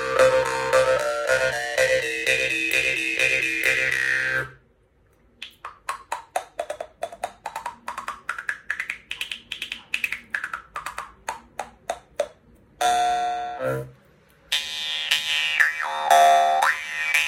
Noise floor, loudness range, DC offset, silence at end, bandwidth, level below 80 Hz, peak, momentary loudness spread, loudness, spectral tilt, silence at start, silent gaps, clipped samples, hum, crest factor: -60 dBFS; 12 LU; under 0.1%; 0 s; 17 kHz; -56 dBFS; -2 dBFS; 16 LU; -23 LUFS; -1.5 dB/octave; 0 s; none; under 0.1%; none; 22 dB